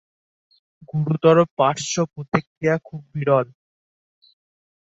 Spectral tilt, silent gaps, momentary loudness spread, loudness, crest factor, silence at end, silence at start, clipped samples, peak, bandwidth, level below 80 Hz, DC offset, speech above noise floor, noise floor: -5.5 dB/octave; 1.51-1.57 s, 2.47-2.61 s; 11 LU; -21 LUFS; 20 dB; 1.5 s; 0.95 s; under 0.1%; -2 dBFS; 8 kHz; -62 dBFS; under 0.1%; over 70 dB; under -90 dBFS